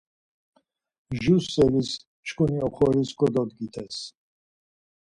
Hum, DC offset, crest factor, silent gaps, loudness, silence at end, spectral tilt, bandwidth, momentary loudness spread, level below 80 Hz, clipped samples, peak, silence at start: none; under 0.1%; 18 dB; 2.07-2.23 s; -25 LUFS; 1.05 s; -6.5 dB/octave; 11 kHz; 14 LU; -52 dBFS; under 0.1%; -8 dBFS; 1.1 s